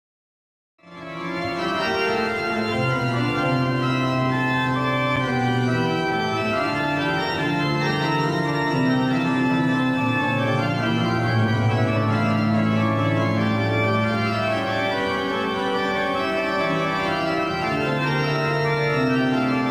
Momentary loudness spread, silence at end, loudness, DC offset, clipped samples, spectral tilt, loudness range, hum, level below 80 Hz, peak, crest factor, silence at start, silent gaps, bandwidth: 3 LU; 0 s; -22 LUFS; 0.1%; under 0.1%; -6.5 dB/octave; 2 LU; none; -52 dBFS; -8 dBFS; 14 dB; 0.85 s; none; 16 kHz